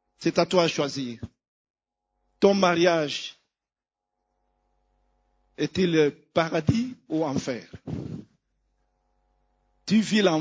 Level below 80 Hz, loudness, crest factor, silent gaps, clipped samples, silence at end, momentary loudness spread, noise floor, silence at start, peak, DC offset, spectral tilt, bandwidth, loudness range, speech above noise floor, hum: -56 dBFS; -24 LUFS; 22 dB; 1.48-1.74 s; under 0.1%; 0 s; 17 LU; under -90 dBFS; 0.2 s; -4 dBFS; under 0.1%; -5.5 dB/octave; 8 kHz; 6 LU; over 66 dB; none